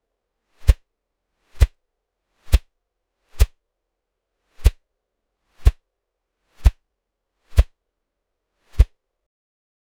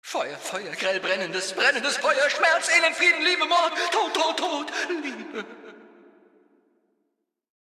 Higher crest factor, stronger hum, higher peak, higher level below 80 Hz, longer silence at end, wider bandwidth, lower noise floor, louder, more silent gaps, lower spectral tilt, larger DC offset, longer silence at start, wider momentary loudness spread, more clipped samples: about the same, 24 dB vs 20 dB; neither; first, 0 dBFS vs -6 dBFS; first, -24 dBFS vs -82 dBFS; second, 1.15 s vs 1.85 s; first, 17 kHz vs 14.5 kHz; about the same, -79 dBFS vs -78 dBFS; about the same, -23 LUFS vs -22 LUFS; neither; first, -5.5 dB/octave vs -1 dB/octave; neither; first, 0.65 s vs 0.05 s; second, 2 LU vs 13 LU; neither